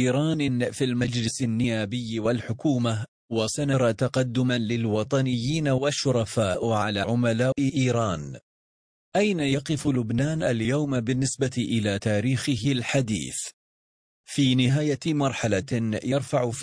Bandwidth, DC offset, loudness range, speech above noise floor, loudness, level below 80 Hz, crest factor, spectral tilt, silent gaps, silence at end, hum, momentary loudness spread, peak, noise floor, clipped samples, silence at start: 10.5 kHz; under 0.1%; 2 LU; over 66 dB; -25 LUFS; -54 dBFS; 16 dB; -5.5 dB/octave; 3.08-3.29 s, 8.43-9.12 s, 13.53-14.24 s; 0 s; none; 5 LU; -10 dBFS; under -90 dBFS; under 0.1%; 0 s